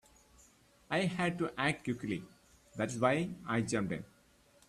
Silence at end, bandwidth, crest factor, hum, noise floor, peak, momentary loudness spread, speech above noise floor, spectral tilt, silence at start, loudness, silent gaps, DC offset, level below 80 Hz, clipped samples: 0.65 s; 13.5 kHz; 22 dB; none; -66 dBFS; -14 dBFS; 10 LU; 31 dB; -5.5 dB/octave; 0.9 s; -35 LUFS; none; under 0.1%; -66 dBFS; under 0.1%